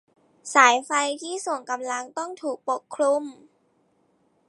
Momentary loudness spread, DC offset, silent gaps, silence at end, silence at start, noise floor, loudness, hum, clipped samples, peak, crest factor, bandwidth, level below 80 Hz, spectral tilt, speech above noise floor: 14 LU; under 0.1%; none; 1.15 s; 0.45 s; -66 dBFS; -23 LUFS; none; under 0.1%; -2 dBFS; 24 dB; 11.5 kHz; -86 dBFS; 0 dB/octave; 42 dB